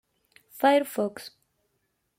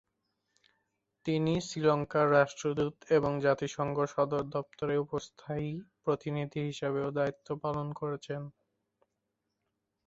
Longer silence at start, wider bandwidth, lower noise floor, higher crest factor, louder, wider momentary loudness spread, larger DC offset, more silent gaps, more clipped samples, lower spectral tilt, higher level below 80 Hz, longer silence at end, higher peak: second, 0.55 s vs 1.25 s; first, 16.5 kHz vs 8 kHz; second, -76 dBFS vs -84 dBFS; about the same, 18 dB vs 22 dB; first, -25 LUFS vs -32 LUFS; first, 21 LU vs 11 LU; neither; neither; neither; second, -4 dB/octave vs -6.5 dB/octave; second, -78 dBFS vs -64 dBFS; second, 0.9 s vs 1.55 s; about the same, -10 dBFS vs -12 dBFS